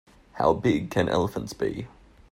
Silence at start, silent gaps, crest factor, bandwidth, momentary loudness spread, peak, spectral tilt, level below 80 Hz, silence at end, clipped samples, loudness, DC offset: 0.35 s; none; 20 dB; 16 kHz; 10 LU; -8 dBFS; -6.5 dB/octave; -50 dBFS; 0.45 s; under 0.1%; -26 LUFS; under 0.1%